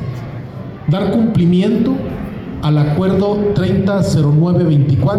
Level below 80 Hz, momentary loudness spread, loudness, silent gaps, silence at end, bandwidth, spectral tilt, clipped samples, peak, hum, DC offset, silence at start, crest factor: -38 dBFS; 13 LU; -14 LUFS; none; 0 s; 10.5 kHz; -8.5 dB/octave; under 0.1%; -4 dBFS; none; under 0.1%; 0 s; 8 dB